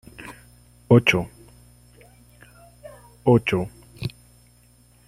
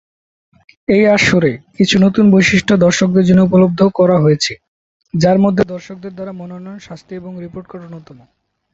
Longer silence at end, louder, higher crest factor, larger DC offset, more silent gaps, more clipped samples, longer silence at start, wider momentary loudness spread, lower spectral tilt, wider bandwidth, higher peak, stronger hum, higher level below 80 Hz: first, 1 s vs 0.7 s; second, -21 LUFS vs -12 LUFS; first, 24 dB vs 14 dB; neither; second, none vs 4.68-5.00 s; neither; second, 0.2 s vs 0.9 s; first, 24 LU vs 21 LU; about the same, -6.5 dB/octave vs -6 dB/octave; first, 15 kHz vs 8 kHz; about the same, -2 dBFS vs 0 dBFS; first, 60 Hz at -45 dBFS vs none; second, -52 dBFS vs -46 dBFS